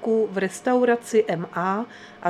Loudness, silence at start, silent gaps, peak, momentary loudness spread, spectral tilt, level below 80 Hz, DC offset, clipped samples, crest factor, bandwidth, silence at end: -23 LUFS; 0 s; none; -8 dBFS; 7 LU; -5.5 dB/octave; -72 dBFS; under 0.1%; under 0.1%; 16 dB; 13.5 kHz; 0 s